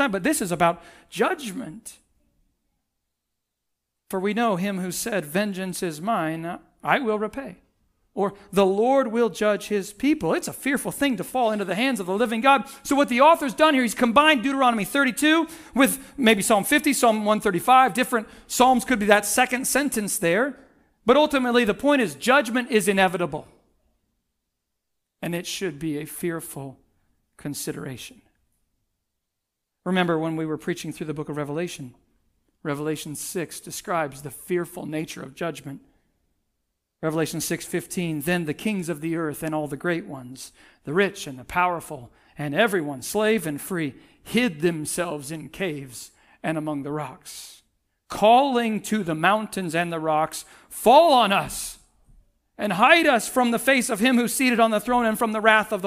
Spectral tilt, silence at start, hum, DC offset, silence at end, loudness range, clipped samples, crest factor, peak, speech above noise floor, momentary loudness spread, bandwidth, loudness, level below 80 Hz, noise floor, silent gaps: -4 dB/octave; 0 s; none; under 0.1%; 0 s; 12 LU; under 0.1%; 22 dB; 0 dBFS; 59 dB; 17 LU; 16 kHz; -22 LUFS; -58 dBFS; -81 dBFS; none